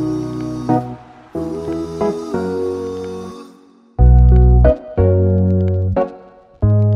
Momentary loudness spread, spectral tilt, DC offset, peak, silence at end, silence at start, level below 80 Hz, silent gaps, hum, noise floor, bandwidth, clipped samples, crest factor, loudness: 19 LU; -10 dB/octave; under 0.1%; 0 dBFS; 0 s; 0 s; -18 dBFS; none; none; -46 dBFS; 6.4 kHz; under 0.1%; 14 dB; -16 LUFS